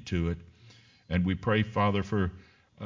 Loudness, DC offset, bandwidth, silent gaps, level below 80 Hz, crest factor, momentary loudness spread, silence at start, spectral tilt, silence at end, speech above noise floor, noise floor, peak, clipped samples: -29 LUFS; under 0.1%; 7.4 kHz; none; -44 dBFS; 18 dB; 7 LU; 0 s; -7.5 dB/octave; 0 s; 28 dB; -57 dBFS; -12 dBFS; under 0.1%